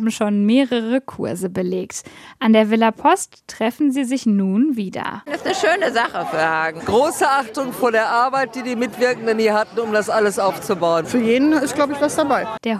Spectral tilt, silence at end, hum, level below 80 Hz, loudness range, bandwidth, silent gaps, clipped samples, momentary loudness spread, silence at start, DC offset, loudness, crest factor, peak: -4.5 dB/octave; 0 s; none; -58 dBFS; 1 LU; 14.5 kHz; none; under 0.1%; 8 LU; 0 s; under 0.1%; -18 LUFS; 16 dB; -2 dBFS